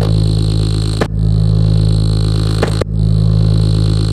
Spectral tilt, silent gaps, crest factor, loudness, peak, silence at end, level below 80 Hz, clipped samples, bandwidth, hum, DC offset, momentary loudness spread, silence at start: -7.5 dB/octave; none; 10 dB; -13 LUFS; 0 dBFS; 0 s; -18 dBFS; under 0.1%; 10 kHz; none; under 0.1%; 3 LU; 0 s